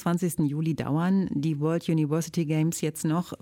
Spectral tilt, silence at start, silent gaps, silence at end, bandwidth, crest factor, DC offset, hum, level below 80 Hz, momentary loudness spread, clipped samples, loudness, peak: -6.5 dB/octave; 0 s; none; 0.05 s; 17 kHz; 12 dB; under 0.1%; none; -60 dBFS; 3 LU; under 0.1%; -27 LUFS; -14 dBFS